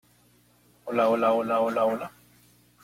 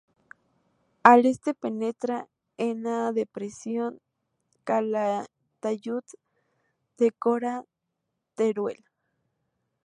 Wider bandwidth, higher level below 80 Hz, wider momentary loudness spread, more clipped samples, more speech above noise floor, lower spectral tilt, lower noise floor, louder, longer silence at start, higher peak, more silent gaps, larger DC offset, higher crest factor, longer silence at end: first, 16 kHz vs 11 kHz; first, -70 dBFS vs -76 dBFS; about the same, 15 LU vs 16 LU; neither; second, 37 dB vs 56 dB; about the same, -6 dB/octave vs -5.5 dB/octave; second, -61 dBFS vs -81 dBFS; about the same, -25 LUFS vs -26 LUFS; second, 0.85 s vs 1.05 s; second, -12 dBFS vs 0 dBFS; neither; neither; second, 16 dB vs 28 dB; second, 0.75 s vs 1.1 s